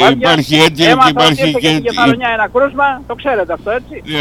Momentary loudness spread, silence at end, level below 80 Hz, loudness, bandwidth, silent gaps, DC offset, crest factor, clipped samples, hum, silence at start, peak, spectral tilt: 11 LU; 0 s; -40 dBFS; -11 LUFS; 18.5 kHz; none; under 0.1%; 12 dB; 0.3%; 60 Hz at -40 dBFS; 0 s; 0 dBFS; -4.5 dB/octave